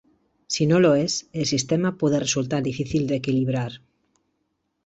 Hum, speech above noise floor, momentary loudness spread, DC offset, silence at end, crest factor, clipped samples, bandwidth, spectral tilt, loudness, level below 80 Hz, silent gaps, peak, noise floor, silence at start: none; 52 dB; 8 LU; under 0.1%; 1.1 s; 18 dB; under 0.1%; 8.2 kHz; -5 dB/octave; -22 LUFS; -56 dBFS; none; -6 dBFS; -74 dBFS; 0.5 s